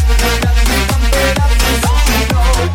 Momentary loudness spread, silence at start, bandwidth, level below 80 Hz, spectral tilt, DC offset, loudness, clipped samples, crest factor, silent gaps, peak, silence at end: 1 LU; 0 s; 17 kHz; -12 dBFS; -4 dB/octave; under 0.1%; -13 LUFS; under 0.1%; 10 dB; none; 0 dBFS; 0 s